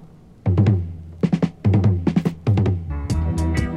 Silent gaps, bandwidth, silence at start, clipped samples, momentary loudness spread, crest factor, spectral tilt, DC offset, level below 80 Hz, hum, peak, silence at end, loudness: none; 11 kHz; 0 s; under 0.1%; 7 LU; 14 dB; -8.5 dB/octave; under 0.1%; -32 dBFS; none; -4 dBFS; 0 s; -21 LUFS